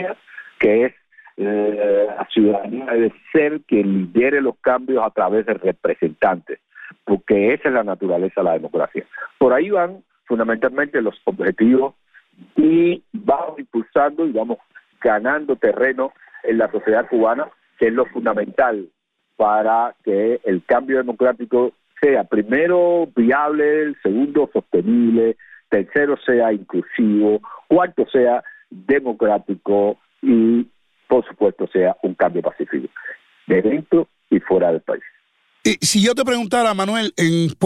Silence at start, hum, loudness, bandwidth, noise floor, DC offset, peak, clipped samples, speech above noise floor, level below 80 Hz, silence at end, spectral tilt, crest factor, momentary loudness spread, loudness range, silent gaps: 0 s; none; -18 LUFS; 14.5 kHz; -60 dBFS; under 0.1%; -4 dBFS; under 0.1%; 42 dB; -58 dBFS; 0 s; -5.5 dB/octave; 14 dB; 9 LU; 2 LU; none